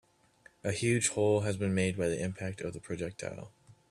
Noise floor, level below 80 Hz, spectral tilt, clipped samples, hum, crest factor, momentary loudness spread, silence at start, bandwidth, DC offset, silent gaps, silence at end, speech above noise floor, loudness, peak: -63 dBFS; -64 dBFS; -5 dB/octave; under 0.1%; none; 18 dB; 13 LU; 0.65 s; 12.5 kHz; under 0.1%; none; 0.2 s; 31 dB; -32 LUFS; -16 dBFS